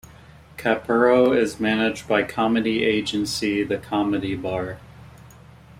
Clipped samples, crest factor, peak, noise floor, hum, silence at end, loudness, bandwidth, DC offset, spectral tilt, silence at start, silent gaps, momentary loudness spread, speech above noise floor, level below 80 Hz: under 0.1%; 18 dB; -6 dBFS; -47 dBFS; none; 0 s; -22 LUFS; 16 kHz; under 0.1%; -5 dB/octave; 0.5 s; none; 10 LU; 26 dB; -52 dBFS